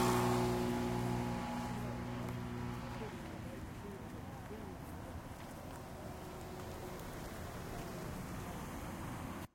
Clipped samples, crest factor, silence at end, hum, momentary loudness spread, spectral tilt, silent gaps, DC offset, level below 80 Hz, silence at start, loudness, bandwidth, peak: under 0.1%; 20 dB; 0.05 s; none; 12 LU; -6 dB/octave; none; under 0.1%; -54 dBFS; 0 s; -42 LUFS; 16.5 kHz; -20 dBFS